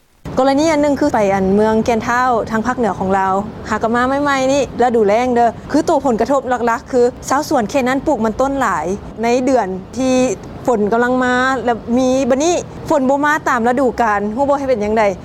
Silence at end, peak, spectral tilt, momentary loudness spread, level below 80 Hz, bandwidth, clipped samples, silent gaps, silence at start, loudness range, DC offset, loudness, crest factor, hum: 0 s; -2 dBFS; -5 dB/octave; 5 LU; -40 dBFS; 14.5 kHz; under 0.1%; none; 0.25 s; 2 LU; under 0.1%; -15 LUFS; 12 dB; none